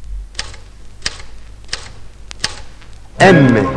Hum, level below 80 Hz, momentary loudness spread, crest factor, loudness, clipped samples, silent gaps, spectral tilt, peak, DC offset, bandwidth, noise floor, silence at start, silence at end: none; -34 dBFS; 27 LU; 16 dB; -14 LUFS; under 0.1%; none; -5.5 dB/octave; 0 dBFS; under 0.1%; 11 kHz; -33 dBFS; 0 s; 0 s